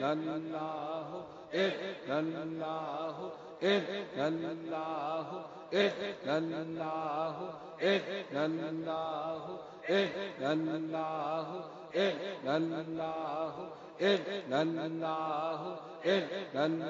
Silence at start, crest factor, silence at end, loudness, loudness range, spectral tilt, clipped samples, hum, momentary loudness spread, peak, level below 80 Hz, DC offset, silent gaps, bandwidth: 0 s; 20 dB; 0 s; -36 LUFS; 2 LU; -3.5 dB/octave; under 0.1%; none; 9 LU; -16 dBFS; -80 dBFS; under 0.1%; none; 7.4 kHz